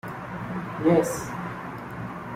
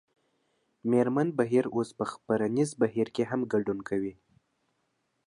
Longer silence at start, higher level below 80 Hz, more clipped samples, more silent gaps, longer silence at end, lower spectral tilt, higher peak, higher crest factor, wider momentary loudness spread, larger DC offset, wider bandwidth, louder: second, 0.05 s vs 0.85 s; first, -54 dBFS vs -68 dBFS; neither; neither; second, 0 s vs 1.15 s; about the same, -6.5 dB/octave vs -7 dB/octave; first, -8 dBFS vs -12 dBFS; about the same, 20 dB vs 18 dB; first, 14 LU vs 8 LU; neither; first, 16 kHz vs 11.5 kHz; about the same, -28 LUFS vs -29 LUFS